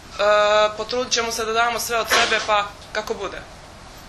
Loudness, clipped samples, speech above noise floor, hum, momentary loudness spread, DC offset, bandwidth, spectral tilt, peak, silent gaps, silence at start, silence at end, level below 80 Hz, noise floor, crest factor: -20 LUFS; under 0.1%; 21 dB; none; 12 LU; under 0.1%; 14 kHz; -1 dB/octave; -4 dBFS; none; 0 s; 0 s; -48 dBFS; -41 dBFS; 18 dB